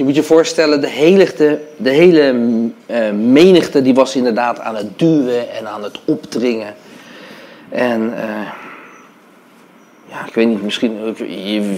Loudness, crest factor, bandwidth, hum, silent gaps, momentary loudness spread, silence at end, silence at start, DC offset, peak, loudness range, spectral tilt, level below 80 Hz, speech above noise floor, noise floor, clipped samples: -14 LUFS; 14 dB; 15.5 kHz; none; none; 16 LU; 0 s; 0 s; under 0.1%; 0 dBFS; 11 LU; -5.5 dB/octave; -62 dBFS; 32 dB; -45 dBFS; 0.1%